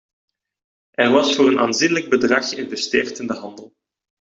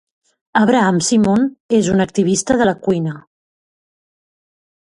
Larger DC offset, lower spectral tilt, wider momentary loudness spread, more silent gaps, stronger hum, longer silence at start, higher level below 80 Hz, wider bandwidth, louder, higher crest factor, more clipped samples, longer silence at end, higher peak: neither; second, -3.5 dB/octave vs -5 dB/octave; first, 13 LU vs 7 LU; second, none vs 1.60-1.69 s; neither; first, 1 s vs 0.55 s; second, -62 dBFS vs -50 dBFS; second, 8 kHz vs 11.5 kHz; about the same, -18 LUFS vs -16 LUFS; about the same, 18 dB vs 16 dB; neither; second, 0.75 s vs 1.75 s; about the same, -2 dBFS vs 0 dBFS